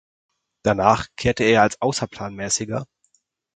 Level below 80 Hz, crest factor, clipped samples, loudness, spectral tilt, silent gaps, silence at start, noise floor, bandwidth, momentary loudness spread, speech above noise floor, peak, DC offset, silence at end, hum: -48 dBFS; 22 dB; under 0.1%; -21 LUFS; -4 dB/octave; none; 0.65 s; -66 dBFS; 9.6 kHz; 13 LU; 46 dB; 0 dBFS; under 0.1%; 0.7 s; none